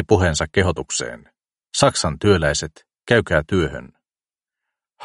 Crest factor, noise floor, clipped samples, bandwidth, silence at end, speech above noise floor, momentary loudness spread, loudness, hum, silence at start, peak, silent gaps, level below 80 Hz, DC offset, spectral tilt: 20 dB; under -90 dBFS; under 0.1%; 11.5 kHz; 0 s; over 71 dB; 9 LU; -19 LUFS; none; 0 s; 0 dBFS; none; -38 dBFS; under 0.1%; -4.5 dB/octave